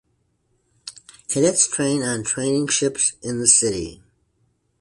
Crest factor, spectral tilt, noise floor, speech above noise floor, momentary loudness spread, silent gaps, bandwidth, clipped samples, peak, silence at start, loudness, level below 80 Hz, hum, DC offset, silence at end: 22 dB; -3 dB/octave; -67 dBFS; 47 dB; 23 LU; none; 11.5 kHz; under 0.1%; 0 dBFS; 0.85 s; -19 LUFS; -54 dBFS; none; under 0.1%; 0.85 s